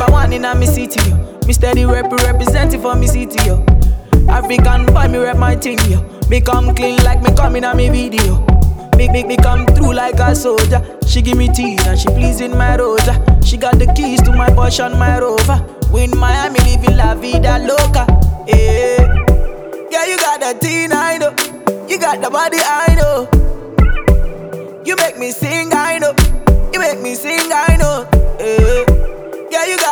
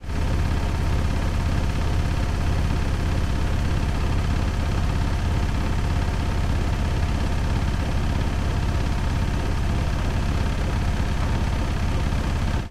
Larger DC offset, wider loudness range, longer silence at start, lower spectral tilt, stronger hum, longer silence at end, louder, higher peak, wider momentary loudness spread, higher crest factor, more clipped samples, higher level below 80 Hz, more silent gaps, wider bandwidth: first, 0.5% vs under 0.1%; about the same, 2 LU vs 0 LU; about the same, 0 s vs 0 s; about the same, -5.5 dB/octave vs -6.5 dB/octave; neither; about the same, 0 s vs 0 s; first, -13 LUFS vs -25 LUFS; first, 0 dBFS vs -10 dBFS; first, 5 LU vs 1 LU; about the same, 10 dB vs 12 dB; first, 0.2% vs under 0.1%; first, -14 dBFS vs -26 dBFS; neither; first, over 20 kHz vs 13.5 kHz